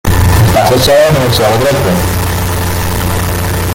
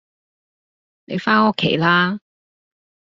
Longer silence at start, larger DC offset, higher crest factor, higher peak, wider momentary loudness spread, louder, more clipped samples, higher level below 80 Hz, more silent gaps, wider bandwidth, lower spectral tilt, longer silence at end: second, 0.05 s vs 1.1 s; neither; second, 10 dB vs 20 dB; about the same, 0 dBFS vs -2 dBFS; second, 7 LU vs 12 LU; first, -10 LUFS vs -17 LUFS; neither; first, -22 dBFS vs -60 dBFS; neither; first, 17 kHz vs 7.6 kHz; first, -5 dB/octave vs -3 dB/octave; second, 0 s vs 0.95 s